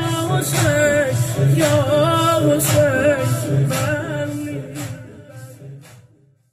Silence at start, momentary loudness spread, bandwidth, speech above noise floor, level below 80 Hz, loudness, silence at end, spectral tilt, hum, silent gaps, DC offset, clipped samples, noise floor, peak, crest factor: 0 s; 22 LU; 15 kHz; 37 dB; -46 dBFS; -17 LUFS; 0.65 s; -5 dB/octave; none; none; under 0.1%; under 0.1%; -53 dBFS; -4 dBFS; 14 dB